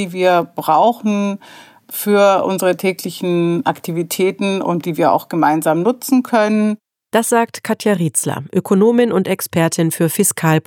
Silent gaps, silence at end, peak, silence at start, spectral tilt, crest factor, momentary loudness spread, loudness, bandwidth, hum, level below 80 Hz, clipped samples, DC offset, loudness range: none; 0.05 s; -2 dBFS; 0 s; -5 dB/octave; 14 dB; 7 LU; -16 LUFS; 18 kHz; none; -72 dBFS; under 0.1%; under 0.1%; 1 LU